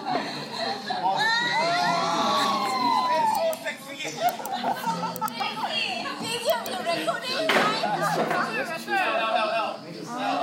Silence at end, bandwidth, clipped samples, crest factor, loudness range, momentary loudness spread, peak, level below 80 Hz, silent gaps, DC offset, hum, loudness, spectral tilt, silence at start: 0 s; 16 kHz; under 0.1%; 18 dB; 4 LU; 7 LU; -8 dBFS; -78 dBFS; none; under 0.1%; none; -25 LUFS; -3 dB/octave; 0 s